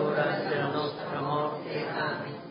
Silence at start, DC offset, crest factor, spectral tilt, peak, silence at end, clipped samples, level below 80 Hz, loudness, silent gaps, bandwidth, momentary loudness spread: 0 s; under 0.1%; 16 dB; -10 dB/octave; -14 dBFS; 0 s; under 0.1%; -70 dBFS; -31 LUFS; none; 5.4 kHz; 5 LU